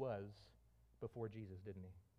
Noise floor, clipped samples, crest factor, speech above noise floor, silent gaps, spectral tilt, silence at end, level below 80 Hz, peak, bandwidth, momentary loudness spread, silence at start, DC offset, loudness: -71 dBFS; under 0.1%; 18 dB; 19 dB; none; -8.5 dB/octave; 0.15 s; -74 dBFS; -32 dBFS; 11.5 kHz; 13 LU; 0 s; under 0.1%; -52 LUFS